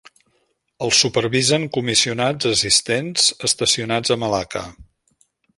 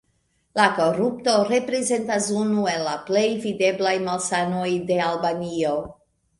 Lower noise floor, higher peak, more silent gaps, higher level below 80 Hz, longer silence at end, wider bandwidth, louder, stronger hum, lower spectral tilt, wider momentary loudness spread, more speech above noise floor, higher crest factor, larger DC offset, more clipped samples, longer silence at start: about the same, -67 dBFS vs -68 dBFS; about the same, -2 dBFS vs -2 dBFS; neither; first, -52 dBFS vs -60 dBFS; first, 0.75 s vs 0.45 s; about the same, 11.5 kHz vs 11.5 kHz; first, -18 LUFS vs -22 LUFS; neither; second, -2.5 dB/octave vs -4 dB/octave; first, 8 LU vs 5 LU; about the same, 48 dB vs 46 dB; about the same, 20 dB vs 20 dB; neither; neither; first, 0.8 s vs 0.55 s